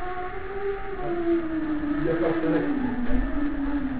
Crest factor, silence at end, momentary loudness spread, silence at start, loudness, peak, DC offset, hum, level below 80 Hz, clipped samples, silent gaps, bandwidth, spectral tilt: 16 dB; 0 s; 7 LU; 0 s; -27 LUFS; -8 dBFS; 2%; none; -36 dBFS; under 0.1%; none; 4 kHz; -11 dB/octave